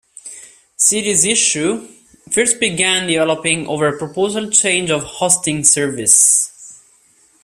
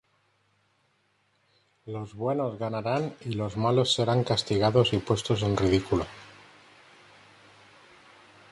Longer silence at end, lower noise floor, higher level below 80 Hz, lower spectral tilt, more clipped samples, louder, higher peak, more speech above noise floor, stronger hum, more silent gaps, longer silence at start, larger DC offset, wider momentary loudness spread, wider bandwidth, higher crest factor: second, 0.7 s vs 2.2 s; second, -53 dBFS vs -70 dBFS; about the same, -56 dBFS vs -52 dBFS; second, -1.5 dB/octave vs -6 dB/octave; neither; first, -14 LUFS vs -27 LUFS; first, 0 dBFS vs -8 dBFS; second, 38 dB vs 44 dB; neither; neither; second, 0.25 s vs 1.85 s; neither; second, 9 LU vs 12 LU; first, 16 kHz vs 11.5 kHz; about the same, 16 dB vs 20 dB